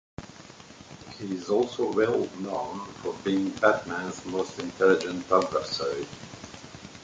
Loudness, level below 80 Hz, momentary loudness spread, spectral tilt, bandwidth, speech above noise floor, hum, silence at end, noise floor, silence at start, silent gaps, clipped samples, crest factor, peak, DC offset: -27 LUFS; -60 dBFS; 21 LU; -5 dB/octave; 9.2 kHz; 21 dB; none; 0 s; -48 dBFS; 0.2 s; none; under 0.1%; 22 dB; -6 dBFS; under 0.1%